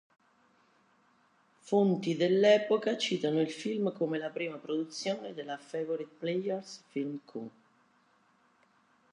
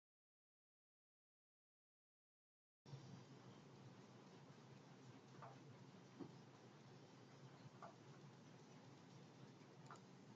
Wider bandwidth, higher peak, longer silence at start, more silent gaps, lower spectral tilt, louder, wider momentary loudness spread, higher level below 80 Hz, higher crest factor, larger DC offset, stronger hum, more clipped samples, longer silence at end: first, 11 kHz vs 7.6 kHz; first, -12 dBFS vs -42 dBFS; second, 1.65 s vs 2.85 s; neither; about the same, -5.5 dB/octave vs -5.5 dB/octave; first, -32 LUFS vs -63 LUFS; first, 14 LU vs 4 LU; about the same, -86 dBFS vs under -90 dBFS; about the same, 22 dB vs 22 dB; neither; neither; neither; first, 1.65 s vs 0 s